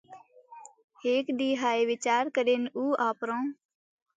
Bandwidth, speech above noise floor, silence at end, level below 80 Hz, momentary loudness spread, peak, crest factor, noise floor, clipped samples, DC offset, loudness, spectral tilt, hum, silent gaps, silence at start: 9.4 kHz; 24 dB; 0.65 s; -84 dBFS; 6 LU; -14 dBFS; 16 dB; -52 dBFS; under 0.1%; under 0.1%; -28 LUFS; -3 dB/octave; none; 0.84-0.88 s; 0.1 s